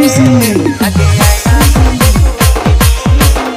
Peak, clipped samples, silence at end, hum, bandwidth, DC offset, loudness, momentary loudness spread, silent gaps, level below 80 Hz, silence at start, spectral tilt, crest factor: 0 dBFS; 0.2%; 0 s; none; 16.5 kHz; under 0.1%; -9 LUFS; 3 LU; none; -12 dBFS; 0 s; -5 dB/octave; 8 dB